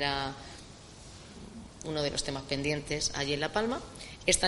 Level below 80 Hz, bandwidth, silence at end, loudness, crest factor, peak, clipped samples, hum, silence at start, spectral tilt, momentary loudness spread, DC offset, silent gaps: -50 dBFS; 11.5 kHz; 0 s; -32 LUFS; 24 dB; -10 dBFS; under 0.1%; none; 0 s; -3 dB/octave; 18 LU; under 0.1%; none